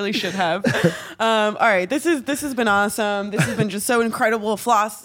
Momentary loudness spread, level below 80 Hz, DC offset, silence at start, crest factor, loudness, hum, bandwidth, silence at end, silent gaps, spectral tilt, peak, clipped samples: 5 LU; -58 dBFS; under 0.1%; 0 s; 18 dB; -20 LUFS; none; 17 kHz; 0 s; none; -4.5 dB/octave; -2 dBFS; under 0.1%